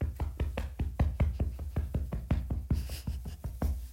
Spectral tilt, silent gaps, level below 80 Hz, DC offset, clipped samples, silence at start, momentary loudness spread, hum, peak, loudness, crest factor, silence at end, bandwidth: -7.5 dB/octave; none; -34 dBFS; under 0.1%; under 0.1%; 0 s; 7 LU; none; -18 dBFS; -35 LUFS; 16 dB; 0 s; 16 kHz